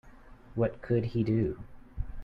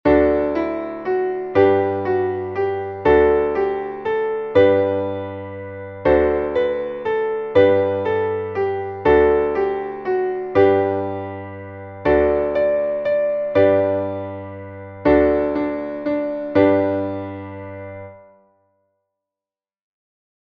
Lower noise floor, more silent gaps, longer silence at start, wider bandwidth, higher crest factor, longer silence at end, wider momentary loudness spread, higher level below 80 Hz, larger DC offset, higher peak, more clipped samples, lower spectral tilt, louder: second, -51 dBFS vs under -90 dBFS; neither; about the same, 0.05 s vs 0.05 s; about the same, 5.4 kHz vs 5.8 kHz; about the same, 16 dB vs 16 dB; second, 0 s vs 2.25 s; about the same, 15 LU vs 16 LU; about the same, -44 dBFS vs -42 dBFS; neither; second, -16 dBFS vs -2 dBFS; neither; first, -10.5 dB/octave vs -9 dB/octave; second, -31 LUFS vs -19 LUFS